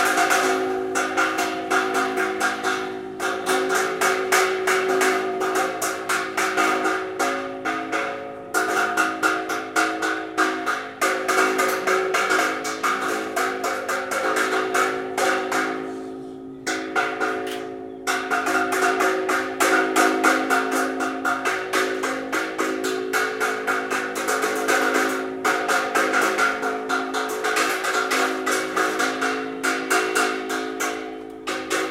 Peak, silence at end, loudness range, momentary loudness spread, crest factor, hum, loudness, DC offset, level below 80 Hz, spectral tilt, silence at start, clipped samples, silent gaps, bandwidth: -4 dBFS; 0 s; 3 LU; 7 LU; 20 dB; none; -22 LUFS; under 0.1%; -64 dBFS; -1.5 dB/octave; 0 s; under 0.1%; none; 16.5 kHz